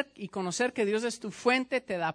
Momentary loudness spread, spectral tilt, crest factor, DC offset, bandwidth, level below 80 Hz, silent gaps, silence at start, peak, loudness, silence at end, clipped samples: 8 LU; -4 dB/octave; 18 dB; under 0.1%; 10.5 kHz; -74 dBFS; none; 0 s; -12 dBFS; -30 LUFS; 0 s; under 0.1%